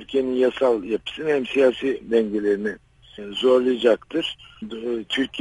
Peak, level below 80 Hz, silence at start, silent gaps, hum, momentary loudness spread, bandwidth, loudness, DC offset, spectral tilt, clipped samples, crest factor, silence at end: -6 dBFS; -56 dBFS; 0 s; none; none; 13 LU; 11.5 kHz; -22 LUFS; under 0.1%; -5 dB/octave; under 0.1%; 16 dB; 0 s